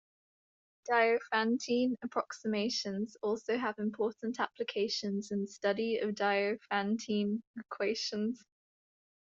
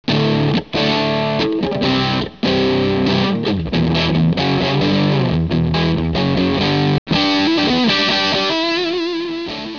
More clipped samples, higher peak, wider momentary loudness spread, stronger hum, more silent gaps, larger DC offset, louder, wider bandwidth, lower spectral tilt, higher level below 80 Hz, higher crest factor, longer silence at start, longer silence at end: neither; second, -14 dBFS vs -4 dBFS; about the same, 6 LU vs 4 LU; neither; about the same, 7.47-7.54 s vs 6.98-7.06 s; second, under 0.1% vs 0.3%; second, -34 LUFS vs -16 LUFS; first, 7.8 kHz vs 5.4 kHz; second, -4.5 dB/octave vs -6.5 dB/octave; second, -80 dBFS vs -38 dBFS; first, 20 dB vs 12 dB; first, 0.85 s vs 0.1 s; first, 0.95 s vs 0 s